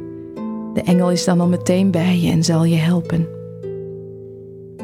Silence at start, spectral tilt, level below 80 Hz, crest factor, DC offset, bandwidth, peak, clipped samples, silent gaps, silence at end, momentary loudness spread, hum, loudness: 0 s; -6.5 dB/octave; -50 dBFS; 14 dB; under 0.1%; 13.5 kHz; -4 dBFS; under 0.1%; none; 0 s; 19 LU; none; -17 LUFS